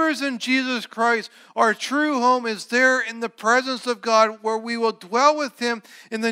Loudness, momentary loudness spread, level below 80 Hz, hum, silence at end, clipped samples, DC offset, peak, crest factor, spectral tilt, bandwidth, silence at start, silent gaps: -21 LUFS; 8 LU; -88 dBFS; none; 0 s; under 0.1%; under 0.1%; -4 dBFS; 18 dB; -2.5 dB/octave; 16 kHz; 0 s; none